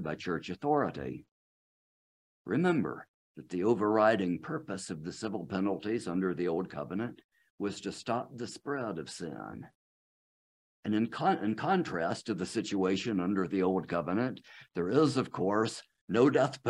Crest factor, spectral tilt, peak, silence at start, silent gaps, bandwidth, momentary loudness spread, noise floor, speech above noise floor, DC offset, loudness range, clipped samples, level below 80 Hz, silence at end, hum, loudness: 20 dB; -6 dB/octave; -12 dBFS; 0 s; 1.31-2.45 s, 3.08-3.35 s, 7.24-7.29 s, 7.50-7.58 s, 9.75-10.83 s, 16.01-16.08 s; 11.5 kHz; 14 LU; under -90 dBFS; over 58 dB; under 0.1%; 7 LU; under 0.1%; -70 dBFS; 0 s; none; -32 LUFS